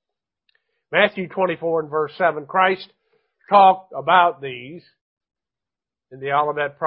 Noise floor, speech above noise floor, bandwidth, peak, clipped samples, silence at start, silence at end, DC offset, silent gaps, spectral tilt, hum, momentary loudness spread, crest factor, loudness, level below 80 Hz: -89 dBFS; 70 dB; 5.4 kHz; 0 dBFS; under 0.1%; 0.9 s; 0 s; under 0.1%; 5.01-5.17 s; -9.5 dB/octave; none; 17 LU; 20 dB; -19 LUFS; -70 dBFS